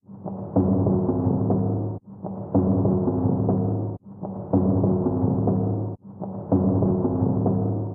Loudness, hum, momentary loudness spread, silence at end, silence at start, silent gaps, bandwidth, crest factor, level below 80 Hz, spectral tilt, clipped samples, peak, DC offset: -23 LUFS; none; 13 LU; 0 s; 0.1 s; none; 1.8 kHz; 16 dB; -48 dBFS; -16.5 dB/octave; under 0.1%; -8 dBFS; under 0.1%